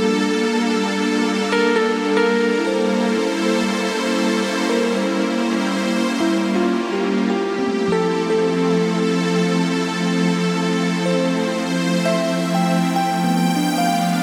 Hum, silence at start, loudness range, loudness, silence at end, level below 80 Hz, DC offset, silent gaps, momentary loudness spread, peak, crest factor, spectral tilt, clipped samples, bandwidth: none; 0 s; 1 LU; -19 LUFS; 0 s; -62 dBFS; under 0.1%; none; 2 LU; -6 dBFS; 12 dB; -5.5 dB/octave; under 0.1%; 19 kHz